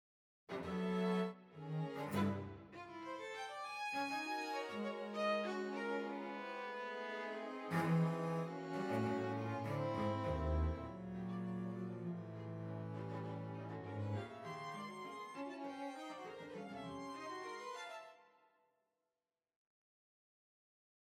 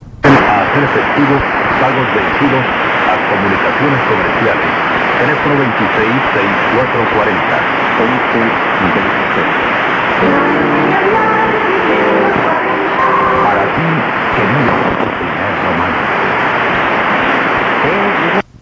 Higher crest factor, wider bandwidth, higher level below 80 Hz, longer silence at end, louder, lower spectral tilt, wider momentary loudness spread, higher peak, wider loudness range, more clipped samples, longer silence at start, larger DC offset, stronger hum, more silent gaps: first, 18 dB vs 12 dB; first, 16 kHz vs 7.8 kHz; second, -58 dBFS vs -38 dBFS; first, 2.8 s vs 0.2 s; second, -43 LUFS vs -11 LUFS; about the same, -6.5 dB/octave vs -6.5 dB/octave; first, 10 LU vs 2 LU; second, -26 dBFS vs 0 dBFS; first, 10 LU vs 1 LU; neither; first, 0.5 s vs 0 s; neither; neither; neither